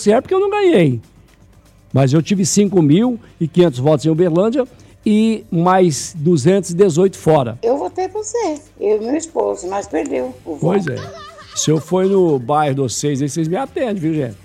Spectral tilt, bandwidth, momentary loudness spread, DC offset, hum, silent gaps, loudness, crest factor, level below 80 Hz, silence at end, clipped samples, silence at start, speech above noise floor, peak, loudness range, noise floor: -6 dB/octave; 14 kHz; 9 LU; under 0.1%; none; none; -16 LUFS; 14 dB; -52 dBFS; 0.1 s; under 0.1%; 0 s; 32 dB; -2 dBFS; 5 LU; -47 dBFS